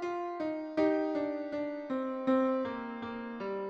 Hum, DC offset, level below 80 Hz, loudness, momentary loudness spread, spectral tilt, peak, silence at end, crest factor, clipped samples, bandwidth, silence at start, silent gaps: none; under 0.1%; -72 dBFS; -34 LUFS; 10 LU; -7 dB/octave; -18 dBFS; 0 s; 16 dB; under 0.1%; 7.4 kHz; 0 s; none